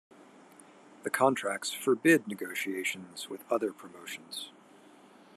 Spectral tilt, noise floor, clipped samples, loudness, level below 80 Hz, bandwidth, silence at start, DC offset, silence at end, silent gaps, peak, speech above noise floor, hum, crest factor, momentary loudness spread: -3.5 dB/octave; -57 dBFS; under 0.1%; -31 LUFS; -86 dBFS; 13.5 kHz; 0.2 s; under 0.1%; 0.85 s; none; -10 dBFS; 26 dB; none; 22 dB; 16 LU